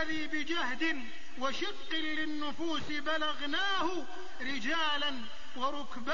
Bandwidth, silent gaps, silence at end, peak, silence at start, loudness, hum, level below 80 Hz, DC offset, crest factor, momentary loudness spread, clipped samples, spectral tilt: 7.2 kHz; none; 0 s; -20 dBFS; 0 s; -34 LUFS; none; -62 dBFS; 2%; 16 dB; 9 LU; under 0.1%; -0.5 dB/octave